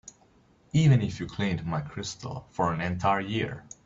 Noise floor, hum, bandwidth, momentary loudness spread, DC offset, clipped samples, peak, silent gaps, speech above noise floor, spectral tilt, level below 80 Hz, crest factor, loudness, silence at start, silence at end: -61 dBFS; none; 7.8 kHz; 13 LU; under 0.1%; under 0.1%; -12 dBFS; none; 34 dB; -6.5 dB/octave; -54 dBFS; 18 dB; -28 LUFS; 0.05 s; 0.25 s